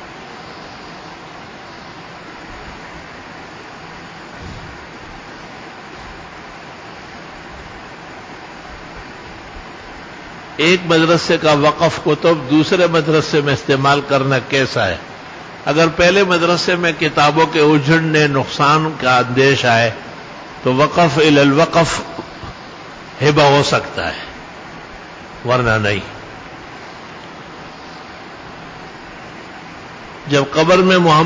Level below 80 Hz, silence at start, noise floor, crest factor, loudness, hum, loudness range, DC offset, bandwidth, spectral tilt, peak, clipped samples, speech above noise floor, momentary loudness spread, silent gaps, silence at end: -44 dBFS; 0 s; -34 dBFS; 14 dB; -14 LUFS; none; 20 LU; under 0.1%; 8 kHz; -5 dB/octave; -2 dBFS; under 0.1%; 21 dB; 21 LU; none; 0 s